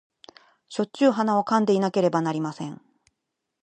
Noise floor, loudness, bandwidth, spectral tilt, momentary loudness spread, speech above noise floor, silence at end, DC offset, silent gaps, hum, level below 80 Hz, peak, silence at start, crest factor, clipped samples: -81 dBFS; -23 LUFS; 9.4 kHz; -6.5 dB/octave; 13 LU; 59 dB; 0.9 s; under 0.1%; none; none; -76 dBFS; -6 dBFS; 0.7 s; 18 dB; under 0.1%